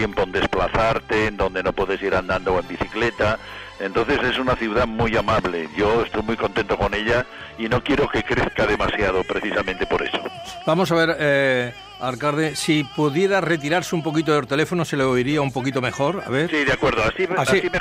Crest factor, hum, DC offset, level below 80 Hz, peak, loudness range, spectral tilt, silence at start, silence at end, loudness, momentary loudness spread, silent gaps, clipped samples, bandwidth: 14 dB; none; under 0.1%; -40 dBFS; -6 dBFS; 1 LU; -5 dB/octave; 0 s; 0 s; -21 LUFS; 5 LU; none; under 0.1%; 16 kHz